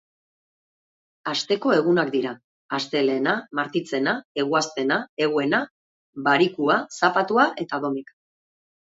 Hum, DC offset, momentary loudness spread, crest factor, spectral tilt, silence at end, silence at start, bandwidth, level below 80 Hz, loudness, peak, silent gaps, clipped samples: none; under 0.1%; 10 LU; 20 dB; -4.5 dB/octave; 0.95 s; 1.25 s; 8 kHz; -72 dBFS; -23 LUFS; -4 dBFS; 2.44-2.69 s, 4.25-4.35 s, 5.09-5.17 s, 5.71-6.13 s; under 0.1%